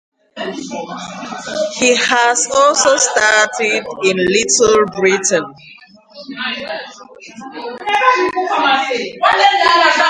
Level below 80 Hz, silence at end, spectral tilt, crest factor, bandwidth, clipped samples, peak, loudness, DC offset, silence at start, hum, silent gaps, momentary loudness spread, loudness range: -54 dBFS; 0 s; -1.5 dB/octave; 14 dB; 11 kHz; under 0.1%; 0 dBFS; -13 LUFS; under 0.1%; 0.35 s; none; none; 16 LU; 7 LU